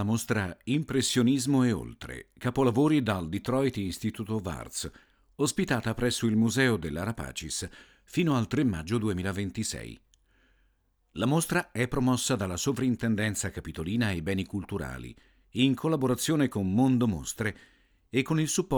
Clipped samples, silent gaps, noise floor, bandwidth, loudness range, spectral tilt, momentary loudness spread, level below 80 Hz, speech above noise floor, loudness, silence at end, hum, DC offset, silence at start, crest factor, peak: under 0.1%; none; -70 dBFS; over 20 kHz; 4 LU; -5 dB/octave; 11 LU; -52 dBFS; 42 dB; -29 LUFS; 0 s; none; under 0.1%; 0 s; 18 dB; -12 dBFS